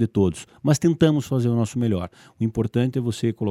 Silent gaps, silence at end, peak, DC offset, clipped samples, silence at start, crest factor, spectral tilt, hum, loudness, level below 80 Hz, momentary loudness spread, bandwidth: none; 0 s; -4 dBFS; under 0.1%; under 0.1%; 0 s; 18 dB; -7 dB/octave; none; -22 LUFS; -50 dBFS; 8 LU; 14 kHz